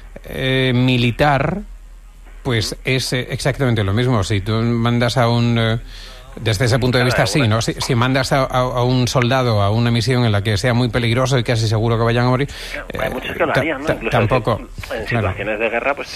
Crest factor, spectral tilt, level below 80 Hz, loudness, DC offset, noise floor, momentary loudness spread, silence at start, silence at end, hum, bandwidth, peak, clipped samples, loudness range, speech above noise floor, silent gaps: 14 dB; -5.5 dB/octave; -34 dBFS; -17 LUFS; under 0.1%; -38 dBFS; 8 LU; 0 s; 0 s; none; 14.5 kHz; -2 dBFS; under 0.1%; 3 LU; 21 dB; none